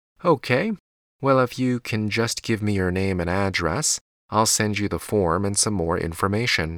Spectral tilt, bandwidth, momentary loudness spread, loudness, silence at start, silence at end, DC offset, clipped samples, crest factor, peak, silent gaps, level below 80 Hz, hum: -4 dB/octave; 19 kHz; 5 LU; -22 LUFS; 0.25 s; 0 s; under 0.1%; under 0.1%; 18 dB; -6 dBFS; 0.80-1.19 s, 4.01-4.29 s; -46 dBFS; none